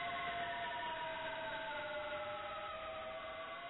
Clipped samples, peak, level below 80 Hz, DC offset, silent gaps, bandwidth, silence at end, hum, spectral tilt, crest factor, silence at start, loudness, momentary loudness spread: under 0.1%; -34 dBFS; -68 dBFS; under 0.1%; none; 4.1 kHz; 0 s; none; -0.5 dB/octave; 10 dB; 0 s; -43 LUFS; 5 LU